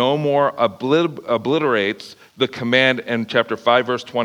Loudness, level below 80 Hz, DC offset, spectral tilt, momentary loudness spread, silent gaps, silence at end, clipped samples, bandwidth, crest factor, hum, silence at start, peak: -18 LUFS; -70 dBFS; under 0.1%; -5.5 dB/octave; 7 LU; none; 0 s; under 0.1%; 13 kHz; 18 dB; none; 0 s; 0 dBFS